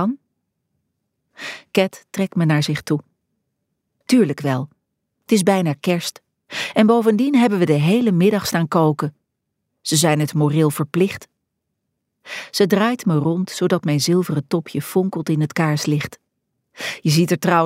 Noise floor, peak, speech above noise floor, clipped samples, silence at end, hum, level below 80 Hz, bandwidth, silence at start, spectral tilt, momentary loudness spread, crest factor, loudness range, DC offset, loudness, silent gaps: -76 dBFS; -2 dBFS; 59 dB; under 0.1%; 0 s; none; -64 dBFS; 16 kHz; 0 s; -5.5 dB/octave; 13 LU; 18 dB; 4 LU; under 0.1%; -19 LUFS; none